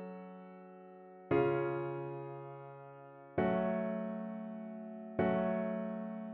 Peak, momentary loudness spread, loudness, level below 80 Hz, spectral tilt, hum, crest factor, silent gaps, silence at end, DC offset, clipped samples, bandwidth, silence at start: -20 dBFS; 20 LU; -37 LUFS; -70 dBFS; -7 dB/octave; none; 18 dB; none; 0 s; under 0.1%; under 0.1%; 4.3 kHz; 0 s